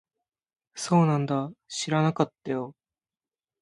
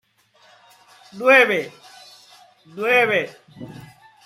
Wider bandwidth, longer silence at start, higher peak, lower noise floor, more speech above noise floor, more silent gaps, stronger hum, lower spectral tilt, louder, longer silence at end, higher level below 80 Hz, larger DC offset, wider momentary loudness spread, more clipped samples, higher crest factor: second, 11.5 kHz vs 15.5 kHz; second, 0.75 s vs 1.15 s; second, -6 dBFS vs -2 dBFS; first, under -90 dBFS vs -56 dBFS; first, over 64 dB vs 38 dB; neither; neither; first, -6 dB/octave vs -4 dB/octave; second, -27 LUFS vs -17 LUFS; first, 0.9 s vs 0.4 s; about the same, -70 dBFS vs -70 dBFS; neither; second, 14 LU vs 26 LU; neither; about the same, 22 dB vs 20 dB